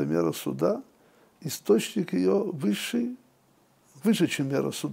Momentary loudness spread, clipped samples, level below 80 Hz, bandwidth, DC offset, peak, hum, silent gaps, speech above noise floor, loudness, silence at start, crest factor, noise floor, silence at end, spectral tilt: 10 LU; under 0.1%; -72 dBFS; 16 kHz; under 0.1%; -10 dBFS; none; none; 37 dB; -27 LUFS; 0 s; 18 dB; -63 dBFS; 0 s; -5.5 dB/octave